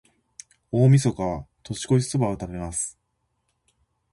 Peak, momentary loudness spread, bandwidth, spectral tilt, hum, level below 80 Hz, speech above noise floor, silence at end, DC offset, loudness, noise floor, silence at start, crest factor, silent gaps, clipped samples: -6 dBFS; 15 LU; 11.5 kHz; -6.5 dB/octave; none; -48 dBFS; 52 dB; 1.2 s; under 0.1%; -23 LUFS; -74 dBFS; 0.75 s; 18 dB; none; under 0.1%